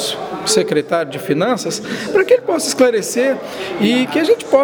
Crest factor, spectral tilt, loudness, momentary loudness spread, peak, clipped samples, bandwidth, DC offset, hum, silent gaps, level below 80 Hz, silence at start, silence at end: 16 dB; -3.5 dB/octave; -16 LUFS; 8 LU; 0 dBFS; under 0.1%; over 20 kHz; under 0.1%; none; none; -60 dBFS; 0 s; 0 s